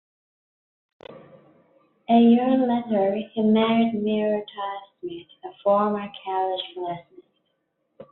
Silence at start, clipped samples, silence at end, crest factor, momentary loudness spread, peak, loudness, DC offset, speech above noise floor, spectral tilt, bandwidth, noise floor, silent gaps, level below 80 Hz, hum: 1.1 s; under 0.1%; 0.05 s; 18 dB; 19 LU; -6 dBFS; -22 LUFS; under 0.1%; 51 dB; -5 dB/octave; 4.2 kHz; -74 dBFS; none; -68 dBFS; none